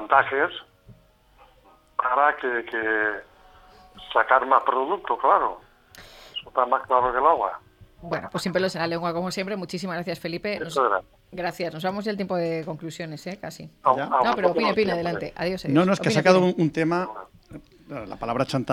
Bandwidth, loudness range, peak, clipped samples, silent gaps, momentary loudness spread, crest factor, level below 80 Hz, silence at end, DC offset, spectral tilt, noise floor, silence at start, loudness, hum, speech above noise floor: 16 kHz; 6 LU; -2 dBFS; under 0.1%; none; 16 LU; 22 dB; -58 dBFS; 0 s; under 0.1%; -5.5 dB/octave; -56 dBFS; 0 s; -24 LUFS; none; 33 dB